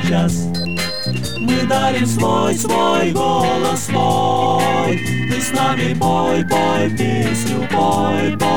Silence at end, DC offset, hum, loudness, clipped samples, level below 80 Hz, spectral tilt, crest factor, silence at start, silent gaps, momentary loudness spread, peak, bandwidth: 0 s; 4%; none; -17 LUFS; under 0.1%; -42 dBFS; -5 dB/octave; 14 dB; 0 s; none; 4 LU; -4 dBFS; 19 kHz